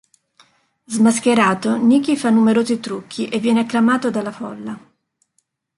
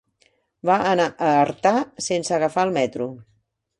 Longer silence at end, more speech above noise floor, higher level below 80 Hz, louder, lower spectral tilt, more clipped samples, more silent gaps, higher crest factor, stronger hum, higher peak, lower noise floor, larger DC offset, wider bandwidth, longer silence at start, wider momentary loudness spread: first, 1 s vs 0.55 s; first, 51 dB vs 44 dB; about the same, -64 dBFS vs -62 dBFS; first, -17 LUFS vs -21 LUFS; about the same, -5 dB/octave vs -4.5 dB/octave; neither; neither; about the same, 14 dB vs 18 dB; neither; about the same, -4 dBFS vs -4 dBFS; first, -68 dBFS vs -64 dBFS; neither; about the same, 11.5 kHz vs 11.5 kHz; first, 0.9 s vs 0.65 s; first, 14 LU vs 8 LU